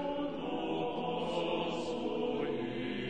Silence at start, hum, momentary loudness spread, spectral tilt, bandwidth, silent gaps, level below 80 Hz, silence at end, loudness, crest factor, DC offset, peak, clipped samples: 0 s; none; 3 LU; -6 dB/octave; 9 kHz; none; -62 dBFS; 0 s; -36 LUFS; 14 dB; 0.3%; -22 dBFS; under 0.1%